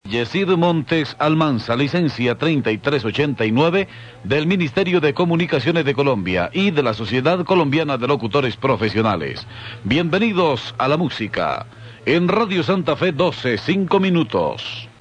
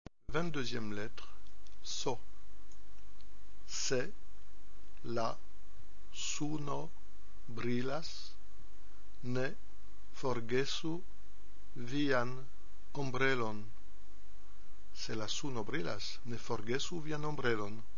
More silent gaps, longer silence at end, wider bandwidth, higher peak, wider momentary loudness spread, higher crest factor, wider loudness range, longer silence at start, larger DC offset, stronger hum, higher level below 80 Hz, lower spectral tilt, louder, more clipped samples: neither; about the same, 0.1 s vs 0 s; first, 9 kHz vs 7.2 kHz; first, -4 dBFS vs -18 dBFS; second, 5 LU vs 17 LU; second, 14 dB vs 22 dB; about the same, 2 LU vs 4 LU; about the same, 0.05 s vs 0.05 s; second, under 0.1% vs 3%; neither; first, -50 dBFS vs -58 dBFS; first, -7 dB/octave vs -4 dB/octave; first, -19 LUFS vs -39 LUFS; neither